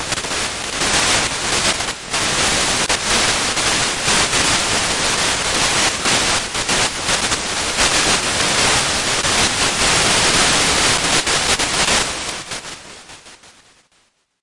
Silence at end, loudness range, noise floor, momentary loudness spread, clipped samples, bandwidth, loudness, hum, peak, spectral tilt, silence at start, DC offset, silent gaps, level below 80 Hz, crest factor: 0.95 s; 3 LU; -60 dBFS; 7 LU; under 0.1%; 11.5 kHz; -15 LUFS; none; -2 dBFS; -1 dB/octave; 0 s; under 0.1%; none; -36 dBFS; 16 dB